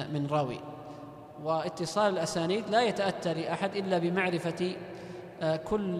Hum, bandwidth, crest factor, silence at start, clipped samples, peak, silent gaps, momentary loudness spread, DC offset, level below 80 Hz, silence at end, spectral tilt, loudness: none; 13.5 kHz; 18 dB; 0 s; under 0.1%; -14 dBFS; none; 16 LU; under 0.1%; -62 dBFS; 0 s; -5.5 dB/octave; -31 LUFS